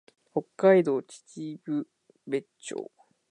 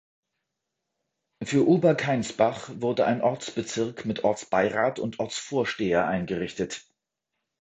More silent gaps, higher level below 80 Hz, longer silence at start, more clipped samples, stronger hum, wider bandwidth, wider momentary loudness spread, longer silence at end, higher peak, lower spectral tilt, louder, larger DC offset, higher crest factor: neither; second, -80 dBFS vs -60 dBFS; second, 0.35 s vs 1.4 s; neither; neither; first, 10.5 kHz vs 9.2 kHz; first, 20 LU vs 10 LU; second, 0.45 s vs 0.85 s; about the same, -8 dBFS vs -6 dBFS; about the same, -6.5 dB/octave vs -5.5 dB/octave; about the same, -28 LUFS vs -26 LUFS; neither; about the same, 20 dB vs 20 dB